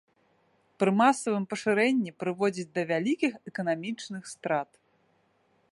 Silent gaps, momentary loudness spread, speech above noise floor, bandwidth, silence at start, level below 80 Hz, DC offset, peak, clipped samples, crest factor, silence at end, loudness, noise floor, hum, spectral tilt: none; 12 LU; 41 dB; 11.5 kHz; 0.8 s; -78 dBFS; under 0.1%; -10 dBFS; under 0.1%; 20 dB; 1.1 s; -28 LUFS; -69 dBFS; none; -5.5 dB/octave